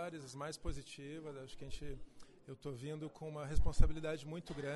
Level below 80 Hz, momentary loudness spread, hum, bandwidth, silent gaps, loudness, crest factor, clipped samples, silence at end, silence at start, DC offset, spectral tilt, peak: -42 dBFS; 14 LU; none; 11.5 kHz; none; -45 LUFS; 24 dB; under 0.1%; 0 s; 0 s; under 0.1%; -6 dB/octave; -14 dBFS